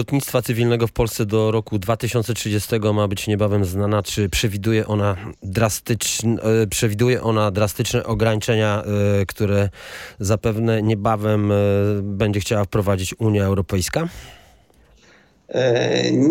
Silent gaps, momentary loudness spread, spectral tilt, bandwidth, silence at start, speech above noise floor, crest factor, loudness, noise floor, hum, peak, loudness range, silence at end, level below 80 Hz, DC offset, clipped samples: none; 4 LU; -5.5 dB/octave; 17 kHz; 0 s; 34 dB; 18 dB; -20 LUFS; -53 dBFS; none; -2 dBFS; 2 LU; 0 s; -42 dBFS; under 0.1%; under 0.1%